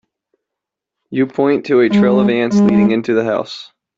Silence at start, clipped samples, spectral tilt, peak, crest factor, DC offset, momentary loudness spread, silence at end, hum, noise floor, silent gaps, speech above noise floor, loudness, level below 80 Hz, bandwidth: 1.1 s; under 0.1%; -7.5 dB/octave; -2 dBFS; 14 dB; under 0.1%; 10 LU; 0.35 s; none; -82 dBFS; none; 69 dB; -14 LUFS; -54 dBFS; 7.4 kHz